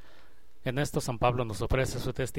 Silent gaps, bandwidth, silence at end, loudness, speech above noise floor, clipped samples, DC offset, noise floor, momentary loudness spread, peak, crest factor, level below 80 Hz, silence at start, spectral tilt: none; 16.5 kHz; 0 s; -31 LUFS; 30 dB; under 0.1%; 1%; -59 dBFS; 5 LU; -12 dBFS; 20 dB; -42 dBFS; 0.65 s; -5.5 dB/octave